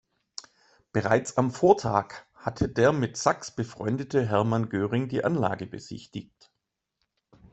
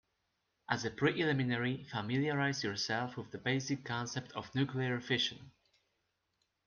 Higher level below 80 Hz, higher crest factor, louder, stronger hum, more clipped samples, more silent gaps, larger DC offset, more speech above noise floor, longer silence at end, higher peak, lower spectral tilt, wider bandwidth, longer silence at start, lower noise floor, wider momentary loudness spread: first, -56 dBFS vs -72 dBFS; about the same, 22 dB vs 22 dB; first, -26 LUFS vs -35 LUFS; neither; neither; neither; neither; first, 57 dB vs 47 dB; first, 1.3 s vs 1.15 s; first, -4 dBFS vs -16 dBFS; about the same, -6 dB/octave vs -5 dB/octave; first, 8.4 kHz vs 7.2 kHz; first, 0.95 s vs 0.7 s; about the same, -83 dBFS vs -82 dBFS; first, 18 LU vs 7 LU